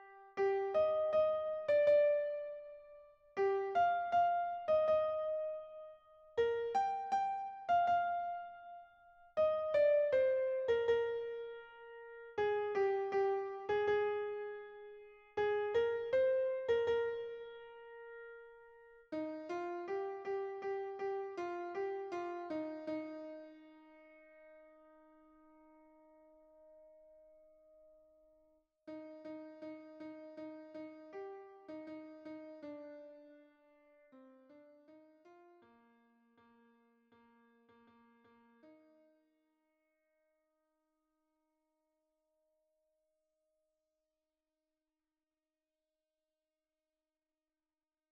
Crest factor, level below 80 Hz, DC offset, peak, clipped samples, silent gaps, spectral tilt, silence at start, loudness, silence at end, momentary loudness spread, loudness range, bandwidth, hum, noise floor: 18 dB; -76 dBFS; under 0.1%; -22 dBFS; under 0.1%; none; -5.5 dB/octave; 0 s; -36 LUFS; 9.4 s; 20 LU; 19 LU; 7.2 kHz; none; under -90 dBFS